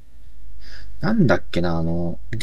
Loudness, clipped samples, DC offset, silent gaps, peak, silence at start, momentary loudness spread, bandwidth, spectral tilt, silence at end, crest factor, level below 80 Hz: -22 LUFS; under 0.1%; 9%; none; -2 dBFS; 0 s; 24 LU; 9.6 kHz; -7.5 dB/octave; 0 s; 20 dB; -40 dBFS